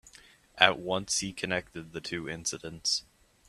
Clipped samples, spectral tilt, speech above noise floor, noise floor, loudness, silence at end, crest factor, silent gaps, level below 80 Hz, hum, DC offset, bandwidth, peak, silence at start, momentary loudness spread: under 0.1%; -2 dB/octave; 26 dB; -57 dBFS; -29 LUFS; 0.45 s; 30 dB; none; -62 dBFS; none; under 0.1%; 14 kHz; -2 dBFS; 0.05 s; 13 LU